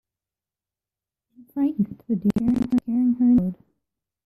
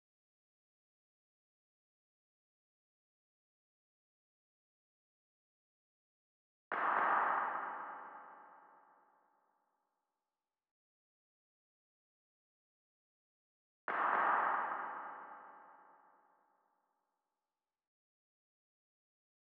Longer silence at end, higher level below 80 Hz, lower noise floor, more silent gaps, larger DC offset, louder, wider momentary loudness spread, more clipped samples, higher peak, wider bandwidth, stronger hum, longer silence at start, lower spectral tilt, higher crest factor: second, 0.7 s vs 3.85 s; first, -52 dBFS vs under -90 dBFS; about the same, under -90 dBFS vs under -90 dBFS; second, none vs 10.71-13.88 s; neither; first, -22 LUFS vs -36 LUFS; second, 9 LU vs 21 LU; neither; first, -10 dBFS vs -20 dBFS; first, 5.4 kHz vs 4.7 kHz; neither; second, 1.55 s vs 6.7 s; first, -9.5 dB/octave vs -0.5 dB/octave; second, 14 dB vs 24 dB